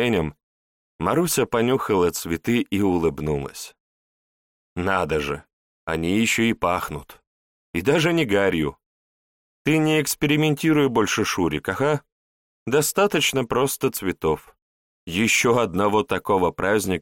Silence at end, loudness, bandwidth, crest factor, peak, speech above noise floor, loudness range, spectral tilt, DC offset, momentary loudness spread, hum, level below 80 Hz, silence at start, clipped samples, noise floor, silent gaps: 0 s; -22 LUFS; 17 kHz; 16 dB; -6 dBFS; over 69 dB; 4 LU; -4.5 dB/octave; under 0.1%; 10 LU; none; -48 dBFS; 0 s; under 0.1%; under -90 dBFS; 0.43-0.99 s, 3.80-4.76 s, 5.53-5.87 s, 7.27-7.74 s, 8.86-9.65 s, 12.12-12.66 s, 14.62-15.07 s